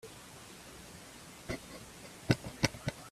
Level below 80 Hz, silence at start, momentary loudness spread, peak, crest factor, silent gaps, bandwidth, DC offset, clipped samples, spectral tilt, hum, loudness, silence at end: -58 dBFS; 0.05 s; 16 LU; -10 dBFS; 30 dB; none; 15.5 kHz; under 0.1%; under 0.1%; -4.5 dB/octave; none; -37 LUFS; 0 s